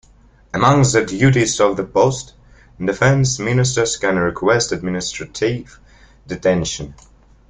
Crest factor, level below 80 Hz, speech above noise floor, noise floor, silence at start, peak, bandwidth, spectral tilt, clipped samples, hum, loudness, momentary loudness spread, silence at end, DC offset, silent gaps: 18 dB; -44 dBFS; 32 dB; -49 dBFS; 0.55 s; 0 dBFS; 9.6 kHz; -5 dB/octave; under 0.1%; none; -17 LUFS; 13 LU; 0.55 s; under 0.1%; none